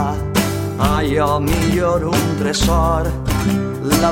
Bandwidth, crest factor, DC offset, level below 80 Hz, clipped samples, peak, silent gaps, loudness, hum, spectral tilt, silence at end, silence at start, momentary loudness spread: 17 kHz; 16 dB; under 0.1%; -26 dBFS; under 0.1%; -2 dBFS; none; -17 LUFS; none; -5.5 dB/octave; 0 s; 0 s; 4 LU